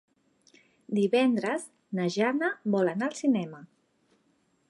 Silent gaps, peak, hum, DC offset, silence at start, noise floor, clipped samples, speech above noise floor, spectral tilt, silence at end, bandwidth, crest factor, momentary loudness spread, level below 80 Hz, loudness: none; -12 dBFS; none; under 0.1%; 0.9 s; -70 dBFS; under 0.1%; 43 dB; -6 dB/octave; 1.05 s; 11.5 kHz; 16 dB; 9 LU; -82 dBFS; -28 LUFS